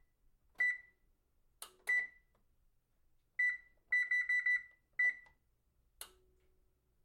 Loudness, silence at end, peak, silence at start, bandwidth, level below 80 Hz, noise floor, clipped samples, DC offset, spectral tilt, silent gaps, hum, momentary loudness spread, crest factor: -35 LUFS; 1 s; -26 dBFS; 0.6 s; 16.5 kHz; -76 dBFS; -77 dBFS; under 0.1%; under 0.1%; 1 dB/octave; none; none; 22 LU; 16 dB